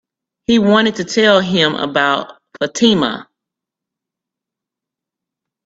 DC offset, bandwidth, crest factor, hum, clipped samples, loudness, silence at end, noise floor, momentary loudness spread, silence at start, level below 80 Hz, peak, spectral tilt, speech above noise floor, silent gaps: under 0.1%; 8 kHz; 18 dB; none; under 0.1%; -14 LUFS; 2.45 s; -84 dBFS; 12 LU; 0.5 s; -56 dBFS; 0 dBFS; -4.5 dB/octave; 70 dB; none